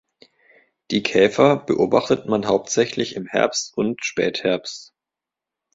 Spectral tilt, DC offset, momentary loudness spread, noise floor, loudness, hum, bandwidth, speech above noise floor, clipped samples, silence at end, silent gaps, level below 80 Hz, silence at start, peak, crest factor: -4 dB/octave; under 0.1%; 8 LU; -87 dBFS; -20 LUFS; none; 7.8 kHz; 67 dB; under 0.1%; 0.9 s; none; -60 dBFS; 0.9 s; -2 dBFS; 20 dB